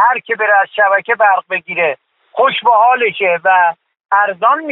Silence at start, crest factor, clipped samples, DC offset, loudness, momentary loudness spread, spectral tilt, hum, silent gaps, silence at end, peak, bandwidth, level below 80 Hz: 0 s; 12 dB; under 0.1%; under 0.1%; -12 LUFS; 6 LU; -6.5 dB/octave; none; none; 0 s; 0 dBFS; 4.1 kHz; -66 dBFS